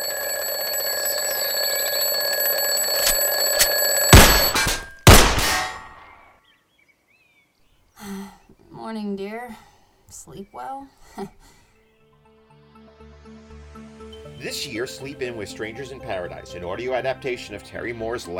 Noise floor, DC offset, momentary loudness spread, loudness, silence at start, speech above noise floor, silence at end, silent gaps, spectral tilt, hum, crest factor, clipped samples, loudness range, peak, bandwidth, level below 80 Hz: -62 dBFS; under 0.1%; 25 LU; -19 LUFS; 0 s; 31 dB; 0 s; none; -3 dB/octave; none; 22 dB; under 0.1%; 24 LU; 0 dBFS; 17 kHz; -32 dBFS